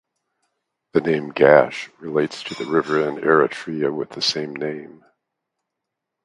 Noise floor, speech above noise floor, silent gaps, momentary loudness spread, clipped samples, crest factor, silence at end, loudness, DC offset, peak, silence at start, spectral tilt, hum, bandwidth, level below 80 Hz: -82 dBFS; 62 dB; none; 14 LU; under 0.1%; 22 dB; 1.35 s; -20 LUFS; under 0.1%; 0 dBFS; 0.95 s; -5 dB/octave; none; 11.5 kHz; -64 dBFS